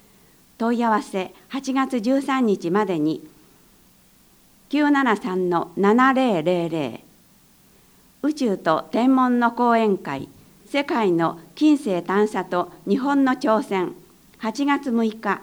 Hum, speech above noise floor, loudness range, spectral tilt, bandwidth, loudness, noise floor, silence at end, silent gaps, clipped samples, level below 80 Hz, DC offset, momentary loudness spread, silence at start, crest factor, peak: none; 34 dB; 3 LU; -6 dB/octave; over 20 kHz; -21 LUFS; -55 dBFS; 0 s; none; under 0.1%; -64 dBFS; under 0.1%; 11 LU; 0.6 s; 18 dB; -4 dBFS